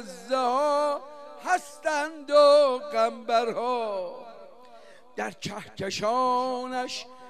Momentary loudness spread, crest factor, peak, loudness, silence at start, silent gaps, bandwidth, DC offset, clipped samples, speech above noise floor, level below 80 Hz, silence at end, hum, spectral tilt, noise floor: 16 LU; 18 dB; -8 dBFS; -26 LUFS; 0 s; none; 13.5 kHz; 0.2%; under 0.1%; 27 dB; -74 dBFS; 0 s; none; -3.5 dB/octave; -52 dBFS